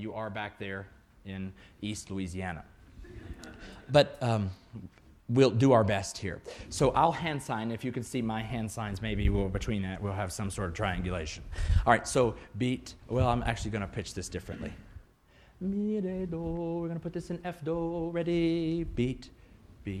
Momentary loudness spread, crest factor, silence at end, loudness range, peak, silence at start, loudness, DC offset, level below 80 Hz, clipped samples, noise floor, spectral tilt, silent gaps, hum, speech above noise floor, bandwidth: 18 LU; 24 dB; 0 s; 8 LU; -8 dBFS; 0 s; -31 LUFS; under 0.1%; -42 dBFS; under 0.1%; -60 dBFS; -6 dB/octave; none; none; 30 dB; 14.5 kHz